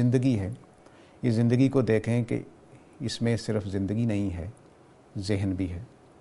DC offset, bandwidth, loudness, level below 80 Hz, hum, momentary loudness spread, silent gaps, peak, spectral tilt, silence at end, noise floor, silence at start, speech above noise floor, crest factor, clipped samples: under 0.1%; 11.5 kHz; -28 LUFS; -54 dBFS; none; 18 LU; none; -10 dBFS; -7.5 dB/octave; 0.35 s; -55 dBFS; 0 s; 29 dB; 18 dB; under 0.1%